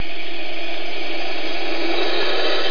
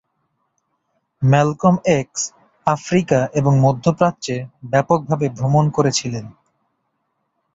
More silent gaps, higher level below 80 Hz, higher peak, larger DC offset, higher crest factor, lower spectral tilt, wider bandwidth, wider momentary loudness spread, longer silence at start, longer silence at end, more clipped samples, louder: neither; second, -60 dBFS vs -52 dBFS; second, -6 dBFS vs -2 dBFS; first, 20% vs under 0.1%; about the same, 16 dB vs 18 dB; second, -4 dB/octave vs -6 dB/octave; second, 5.4 kHz vs 8 kHz; about the same, 8 LU vs 10 LU; second, 0 s vs 1.2 s; second, 0 s vs 1.25 s; neither; second, -24 LUFS vs -18 LUFS